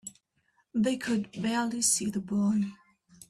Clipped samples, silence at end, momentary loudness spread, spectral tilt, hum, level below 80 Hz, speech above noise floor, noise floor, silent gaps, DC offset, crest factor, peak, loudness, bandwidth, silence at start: under 0.1%; 0.55 s; 9 LU; -3.5 dB/octave; none; -68 dBFS; 44 dB; -72 dBFS; none; under 0.1%; 18 dB; -14 dBFS; -29 LUFS; 14.5 kHz; 0.05 s